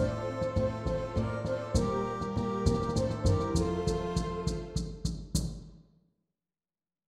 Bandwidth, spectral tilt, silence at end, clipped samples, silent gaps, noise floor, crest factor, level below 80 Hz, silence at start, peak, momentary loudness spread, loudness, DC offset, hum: 14.5 kHz; -6.5 dB/octave; 1.25 s; under 0.1%; none; under -90 dBFS; 18 dB; -40 dBFS; 0 s; -14 dBFS; 7 LU; -32 LUFS; under 0.1%; none